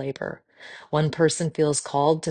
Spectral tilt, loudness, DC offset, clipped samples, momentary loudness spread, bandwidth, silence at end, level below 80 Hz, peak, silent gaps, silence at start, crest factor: -5 dB/octave; -24 LUFS; under 0.1%; under 0.1%; 20 LU; 10 kHz; 0 s; -62 dBFS; -6 dBFS; none; 0 s; 18 dB